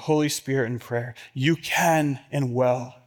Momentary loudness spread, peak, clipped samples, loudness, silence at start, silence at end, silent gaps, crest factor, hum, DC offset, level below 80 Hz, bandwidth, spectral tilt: 9 LU; -10 dBFS; under 0.1%; -24 LUFS; 0 s; 0.15 s; none; 16 dB; none; under 0.1%; -66 dBFS; 18 kHz; -5 dB/octave